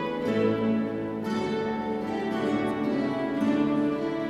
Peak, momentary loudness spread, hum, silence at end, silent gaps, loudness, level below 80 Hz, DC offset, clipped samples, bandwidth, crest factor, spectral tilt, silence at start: -14 dBFS; 5 LU; none; 0 s; none; -27 LUFS; -58 dBFS; under 0.1%; under 0.1%; 12.5 kHz; 14 dB; -7 dB/octave; 0 s